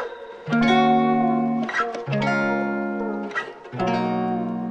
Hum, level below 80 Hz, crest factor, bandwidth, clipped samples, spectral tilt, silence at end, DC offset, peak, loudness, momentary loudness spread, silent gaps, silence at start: none; -58 dBFS; 16 dB; 8.2 kHz; under 0.1%; -6.5 dB/octave; 0 s; under 0.1%; -6 dBFS; -22 LUFS; 11 LU; none; 0 s